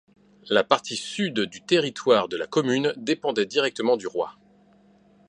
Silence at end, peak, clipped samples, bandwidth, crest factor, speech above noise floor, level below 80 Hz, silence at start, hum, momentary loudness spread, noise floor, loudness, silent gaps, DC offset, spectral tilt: 0.95 s; -2 dBFS; under 0.1%; 11 kHz; 24 dB; 33 dB; -70 dBFS; 0.45 s; none; 7 LU; -57 dBFS; -24 LUFS; none; under 0.1%; -4 dB/octave